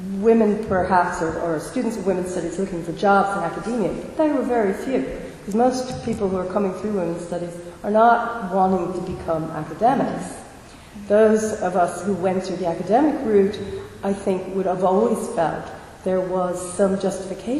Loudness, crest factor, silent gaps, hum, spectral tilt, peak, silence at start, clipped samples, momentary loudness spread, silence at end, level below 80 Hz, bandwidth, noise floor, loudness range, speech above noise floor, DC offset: -22 LUFS; 18 dB; none; none; -6.5 dB/octave; -4 dBFS; 0 s; under 0.1%; 12 LU; 0 s; -48 dBFS; 13 kHz; -42 dBFS; 2 LU; 21 dB; under 0.1%